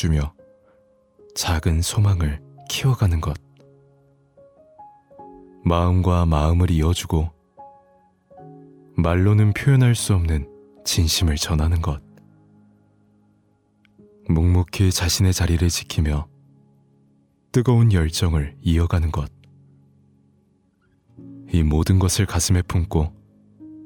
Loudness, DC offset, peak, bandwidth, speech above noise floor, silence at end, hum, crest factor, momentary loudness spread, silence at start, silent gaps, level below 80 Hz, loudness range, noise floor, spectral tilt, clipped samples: -20 LUFS; under 0.1%; -4 dBFS; 18.5 kHz; 44 dB; 0 s; none; 18 dB; 12 LU; 0 s; none; -30 dBFS; 6 LU; -62 dBFS; -5.5 dB/octave; under 0.1%